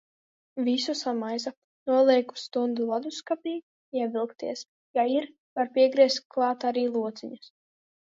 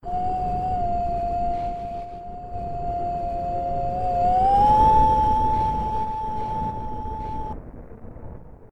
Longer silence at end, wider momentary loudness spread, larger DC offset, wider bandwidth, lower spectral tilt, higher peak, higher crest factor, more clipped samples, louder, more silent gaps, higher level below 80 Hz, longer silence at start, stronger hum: first, 0.75 s vs 0.05 s; second, 16 LU vs 19 LU; neither; second, 7.8 kHz vs 9.6 kHz; second, -3.5 dB/octave vs -8 dB/octave; about the same, -8 dBFS vs -6 dBFS; about the same, 20 dB vs 16 dB; neither; second, -27 LUFS vs -23 LUFS; first, 1.57-1.86 s, 3.63-3.92 s, 4.68-4.94 s, 5.38-5.56 s, 6.25-6.30 s vs none; second, -82 dBFS vs -34 dBFS; first, 0.55 s vs 0.05 s; neither